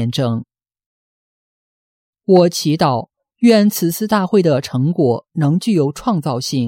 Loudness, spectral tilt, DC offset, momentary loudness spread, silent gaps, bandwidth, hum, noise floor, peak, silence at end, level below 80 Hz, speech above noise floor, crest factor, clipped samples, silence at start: -16 LUFS; -6 dB/octave; under 0.1%; 7 LU; 0.86-2.13 s; 16.5 kHz; none; under -90 dBFS; -2 dBFS; 0 s; -56 dBFS; over 75 dB; 14 dB; under 0.1%; 0 s